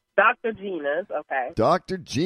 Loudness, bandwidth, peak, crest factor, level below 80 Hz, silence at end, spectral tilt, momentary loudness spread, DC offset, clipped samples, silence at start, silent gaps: -24 LUFS; 11 kHz; -6 dBFS; 18 dB; -54 dBFS; 0 s; -5.5 dB/octave; 9 LU; under 0.1%; under 0.1%; 0.15 s; none